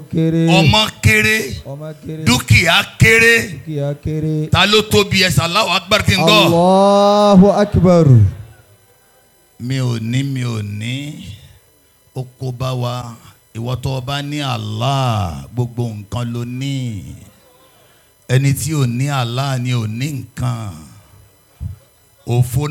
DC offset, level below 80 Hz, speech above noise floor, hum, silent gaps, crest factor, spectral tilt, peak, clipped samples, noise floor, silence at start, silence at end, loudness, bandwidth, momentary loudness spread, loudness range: under 0.1%; -40 dBFS; 38 dB; none; none; 16 dB; -5 dB/octave; 0 dBFS; under 0.1%; -52 dBFS; 0 s; 0 s; -14 LUFS; 19 kHz; 19 LU; 12 LU